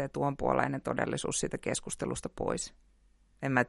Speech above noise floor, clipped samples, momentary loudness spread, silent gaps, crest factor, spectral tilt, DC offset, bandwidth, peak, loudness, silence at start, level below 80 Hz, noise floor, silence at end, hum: 32 dB; under 0.1%; 7 LU; none; 22 dB; -4.5 dB/octave; under 0.1%; 11.5 kHz; -12 dBFS; -33 LUFS; 0 s; -54 dBFS; -65 dBFS; 0 s; none